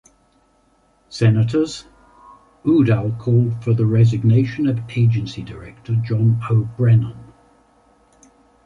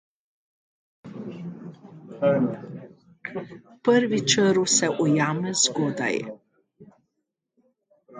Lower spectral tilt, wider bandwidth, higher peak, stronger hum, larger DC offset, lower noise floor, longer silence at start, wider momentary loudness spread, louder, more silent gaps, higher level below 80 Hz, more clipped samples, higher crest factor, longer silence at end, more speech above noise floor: first, -8.5 dB/octave vs -3.5 dB/octave; second, 7.6 kHz vs 9.6 kHz; about the same, -4 dBFS vs -4 dBFS; neither; neither; second, -59 dBFS vs -80 dBFS; about the same, 1.1 s vs 1.05 s; second, 14 LU vs 22 LU; first, -18 LUFS vs -22 LUFS; neither; first, -48 dBFS vs -70 dBFS; neither; second, 16 dB vs 22 dB; first, 1.4 s vs 0 s; second, 42 dB vs 58 dB